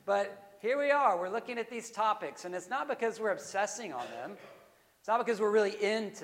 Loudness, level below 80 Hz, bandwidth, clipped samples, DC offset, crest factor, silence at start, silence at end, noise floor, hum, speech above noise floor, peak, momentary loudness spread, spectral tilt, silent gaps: -32 LUFS; -84 dBFS; 16 kHz; under 0.1%; under 0.1%; 18 dB; 0.05 s; 0 s; -62 dBFS; none; 29 dB; -14 dBFS; 13 LU; -3.5 dB/octave; none